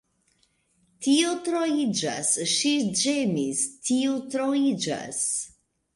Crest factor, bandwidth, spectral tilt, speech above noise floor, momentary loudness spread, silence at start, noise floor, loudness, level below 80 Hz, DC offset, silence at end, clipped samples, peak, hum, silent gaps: 16 dB; 11.5 kHz; -3 dB/octave; 43 dB; 6 LU; 1 s; -68 dBFS; -25 LUFS; -68 dBFS; under 0.1%; 0.5 s; under 0.1%; -10 dBFS; none; none